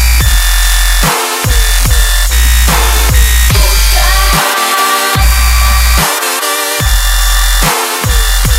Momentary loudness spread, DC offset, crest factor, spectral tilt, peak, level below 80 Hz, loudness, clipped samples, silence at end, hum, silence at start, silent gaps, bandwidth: 3 LU; under 0.1%; 8 dB; -2.5 dB/octave; 0 dBFS; -10 dBFS; -9 LUFS; 0.2%; 0 s; none; 0 s; none; 16.5 kHz